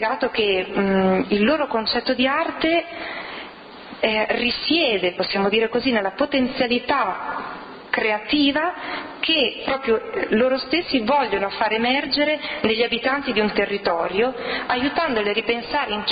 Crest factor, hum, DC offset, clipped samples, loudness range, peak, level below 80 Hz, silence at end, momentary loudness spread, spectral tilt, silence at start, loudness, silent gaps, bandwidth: 14 dB; none; under 0.1%; under 0.1%; 2 LU; -6 dBFS; -52 dBFS; 0 s; 8 LU; -8 dB/octave; 0 s; -21 LUFS; none; 5.2 kHz